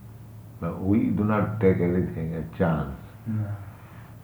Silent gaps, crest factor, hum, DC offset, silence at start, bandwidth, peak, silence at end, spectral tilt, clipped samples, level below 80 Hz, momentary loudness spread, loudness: none; 20 dB; none; under 0.1%; 0 s; over 20 kHz; -8 dBFS; 0.05 s; -10 dB/octave; under 0.1%; -50 dBFS; 22 LU; -26 LUFS